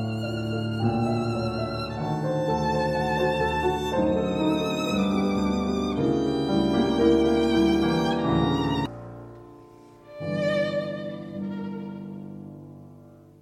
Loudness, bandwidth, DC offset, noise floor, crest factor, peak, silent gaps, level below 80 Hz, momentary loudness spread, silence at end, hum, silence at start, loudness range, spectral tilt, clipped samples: -25 LUFS; 14.5 kHz; under 0.1%; -49 dBFS; 16 dB; -10 dBFS; none; -44 dBFS; 16 LU; 0.3 s; none; 0 s; 8 LU; -7 dB/octave; under 0.1%